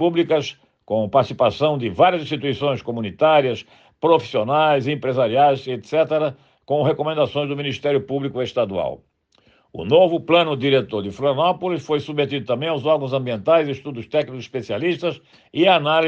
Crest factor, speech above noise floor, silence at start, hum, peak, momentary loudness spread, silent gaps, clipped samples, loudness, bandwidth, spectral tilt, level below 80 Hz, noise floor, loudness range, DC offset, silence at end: 16 dB; 39 dB; 0 s; none; -4 dBFS; 10 LU; none; under 0.1%; -20 LUFS; 7.6 kHz; -6.5 dB/octave; -62 dBFS; -59 dBFS; 3 LU; under 0.1%; 0 s